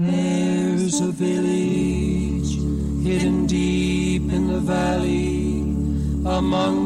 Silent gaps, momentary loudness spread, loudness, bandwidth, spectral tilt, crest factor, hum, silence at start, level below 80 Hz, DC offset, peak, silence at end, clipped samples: none; 3 LU; -21 LUFS; 12 kHz; -6 dB/octave; 10 dB; none; 0 s; -30 dBFS; under 0.1%; -10 dBFS; 0 s; under 0.1%